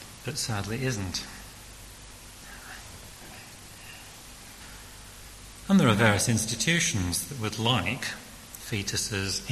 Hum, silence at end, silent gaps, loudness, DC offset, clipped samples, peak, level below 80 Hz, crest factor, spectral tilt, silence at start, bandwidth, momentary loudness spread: none; 0 s; none; -26 LUFS; under 0.1%; under 0.1%; -8 dBFS; -52 dBFS; 22 dB; -3.5 dB/octave; 0 s; 13 kHz; 22 LU